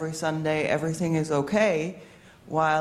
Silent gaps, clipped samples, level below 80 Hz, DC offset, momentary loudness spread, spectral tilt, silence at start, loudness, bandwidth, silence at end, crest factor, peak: none; under 0.1%; -60 dBFS; under 0.1%; 8 LU; -5.5 dB/octave; 0 s; -26 LUFS; 14 kHz; 0 s; 16 dB; -10 dBFS